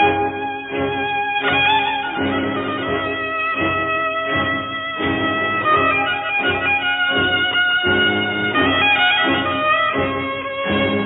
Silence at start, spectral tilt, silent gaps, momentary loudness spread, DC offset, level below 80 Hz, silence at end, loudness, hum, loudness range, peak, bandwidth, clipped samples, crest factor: 0 s; -8 dB/octave; none; 7 LU; under 0.1%; -50 dBFS; 0 s; -17 LUFS; none; 4 LU; -6 dBFS; 4.1 kHz; under 0.1%; 14 dB